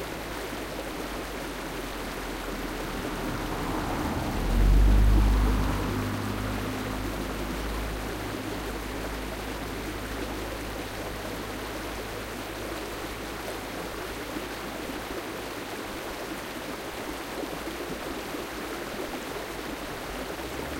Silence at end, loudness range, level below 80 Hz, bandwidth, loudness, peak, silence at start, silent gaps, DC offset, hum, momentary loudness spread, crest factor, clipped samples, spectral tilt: 0 s; 8 LU; -32 dBFS; 16 kHz; -32 LUFS; -12 dBFS; 0 s; none; under 0.1%; none; 8 LU; 18 dB; under 0.1%; -5 dB/octave